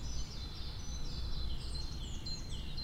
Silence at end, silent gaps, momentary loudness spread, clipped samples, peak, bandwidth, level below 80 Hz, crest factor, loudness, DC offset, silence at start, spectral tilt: 0 s; none; 2 LU; under 0.1%; -26 dBFS; 15 kHz; -42 dBFS; 12 dB; -43 LUFS; under 0.1%; 0 s; -4 dB/octave